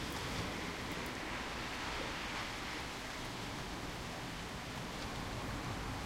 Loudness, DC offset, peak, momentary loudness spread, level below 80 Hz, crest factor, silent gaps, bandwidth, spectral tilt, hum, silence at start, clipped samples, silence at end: -42 LUFS; under 0.1%; -26 dBFS; 3 LU; -52 dBFS; 16 dB; none; 16 kHz; -3.5 dB/octave; none; 0 s; under 0.1%; 0 s